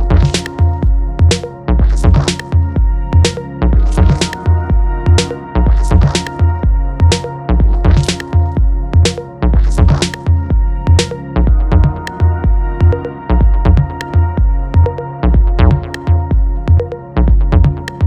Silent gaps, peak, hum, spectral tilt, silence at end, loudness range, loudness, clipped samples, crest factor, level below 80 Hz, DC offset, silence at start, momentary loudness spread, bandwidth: none; 0 dBFS; none; -6 dB/octave; 0 s; 1 LU; -13 LUFS; under 0.1%; 10 dB; -14 dBFS; under 0.1%; 0 s; 4 LU; 11 kHz